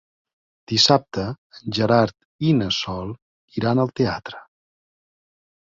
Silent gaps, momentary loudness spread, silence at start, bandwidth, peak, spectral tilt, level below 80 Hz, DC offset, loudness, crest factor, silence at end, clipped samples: 1.38-1.50 s, 2.25-2.39 s, 3.22-3.48 s; 18 LU; 0.7 s; 7.8 kHz; -2 dBFS; -5 dB/octave; -52 dBFS; under 0.1%; -21 LUFS; 22 dB; 1.35 s; under 0.1%